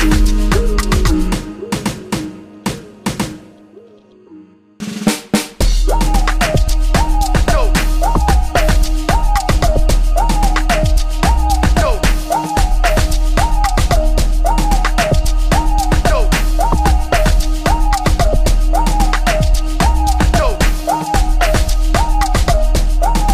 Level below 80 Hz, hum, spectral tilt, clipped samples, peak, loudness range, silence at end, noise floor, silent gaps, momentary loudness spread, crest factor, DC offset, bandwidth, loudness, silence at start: -14 dBFS; none; -5 dB/octave; under 0.1%; 0 dBFS; 6 LU; 0 s; -43 dBFS; none; 6 LU; 12 dB; under 0.1%; 15.5 kHz; -16 LUFS; 0 s